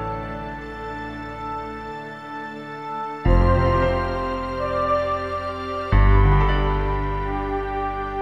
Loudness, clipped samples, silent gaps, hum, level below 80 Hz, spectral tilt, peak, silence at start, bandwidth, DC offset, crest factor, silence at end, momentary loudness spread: -23 LUFS; under 0.1%; none; none; -26 dBFS; -8.5 dB/octave; -4 dBFS; 0 s; 6 kHz; 0.1%; 18 dB; 0 s; 14 LU